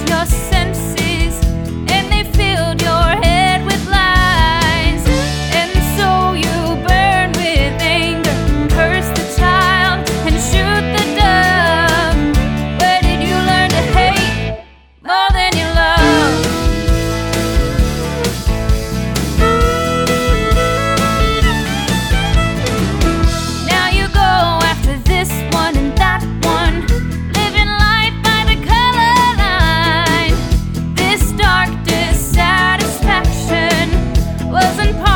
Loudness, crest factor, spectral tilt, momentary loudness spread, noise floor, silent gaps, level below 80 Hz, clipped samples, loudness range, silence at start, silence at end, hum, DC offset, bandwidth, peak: -13 LUFS; 12 dB; -4.5 dB/octave; 6 LU; -37 dBFS; none; -18 dBFS; under 0.1%; 2 LU; 0 s; 0 s; none; under 0.1%; 19 kHz; 0 dBFS